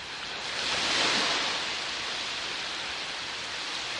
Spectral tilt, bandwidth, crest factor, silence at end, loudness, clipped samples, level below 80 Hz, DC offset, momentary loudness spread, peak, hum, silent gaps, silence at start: -0.5 dB/octave; 11.5 kHz; 18 dB; 0 s; -29 LUFS; under 0.1%; -62 dBFS; under 0.1%; 9 LU; -14 dBFS; none; none; 0 s